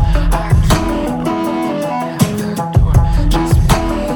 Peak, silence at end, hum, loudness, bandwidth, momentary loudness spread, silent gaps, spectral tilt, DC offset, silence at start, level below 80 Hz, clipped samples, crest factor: 0 dBFS; 0 s; none; -15 LUFS; 19 kHz; 5 LU; none; -6.5 dB/octave; under 0.1%; 0 s; -18 dBFS; 0.1%; 12 dB